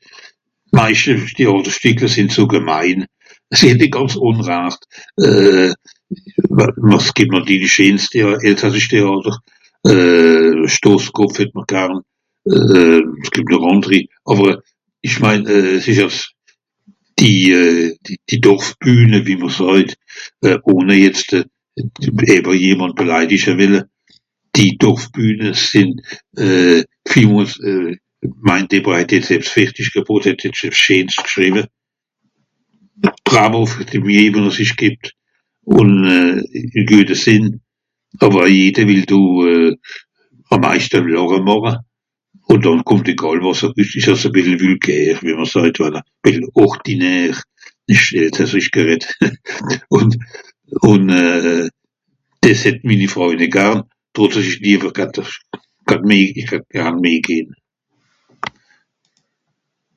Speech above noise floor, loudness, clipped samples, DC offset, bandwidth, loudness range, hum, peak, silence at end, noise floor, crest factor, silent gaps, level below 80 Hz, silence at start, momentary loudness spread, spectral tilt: 61 dB; -12 LUFS; 0.4%; under 0.1%; 10 kHz; 3 LU; none; 0 dBFS; 2.5 s; -73 dBFS; 14 dB; none; -50 dBFS; 0.7 s; 12 LU; -5 dB/octave